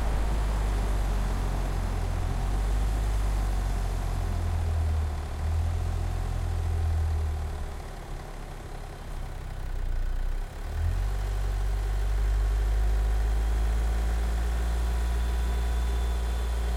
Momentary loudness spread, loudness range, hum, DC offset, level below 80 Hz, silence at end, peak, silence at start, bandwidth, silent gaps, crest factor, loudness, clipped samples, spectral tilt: 10 LU; 6 LU; none; under 0.1%; -28 dBFS; 0 s; -18 dBFS; 0 s; 15 kHz; none; 10 dB; -31 LUFS; under 0.1%; -6 dB/octave